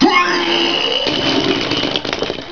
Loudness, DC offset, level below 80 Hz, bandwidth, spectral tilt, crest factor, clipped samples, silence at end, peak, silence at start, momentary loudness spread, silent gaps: -15 LUFS; 0.9%; -44 dBFS; 5.4 kHz; -3.5 dB/octave; 16 dB; under 0.1%; 0 s; 0 dBFS; 0 s; 6 LU; none